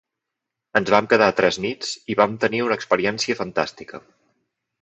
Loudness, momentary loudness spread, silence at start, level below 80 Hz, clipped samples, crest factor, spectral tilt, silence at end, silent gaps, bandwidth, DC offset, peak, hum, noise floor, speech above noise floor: -20 LUFS; 11 LU; 0.75 s; -60 dBFS; under 0.1%; 22 dB; -4 dB/octave; 0.85 s; none; 8.4 kHz; under 0.1%; -2 dBFS; none; -83 dBFS; 63 dB